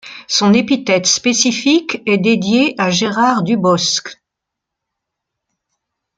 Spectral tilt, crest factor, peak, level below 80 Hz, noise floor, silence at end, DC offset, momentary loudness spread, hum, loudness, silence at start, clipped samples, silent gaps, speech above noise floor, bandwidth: -3.5 dB/octave; 14 dB; 0 dBFS; -58 dBFS; -80 dBFS; 2.05 s; under 0.1%; 4 LU; none; -14 LUFS; 0.05 s; under 0.1%; none; 66 dB; 9.4 kHz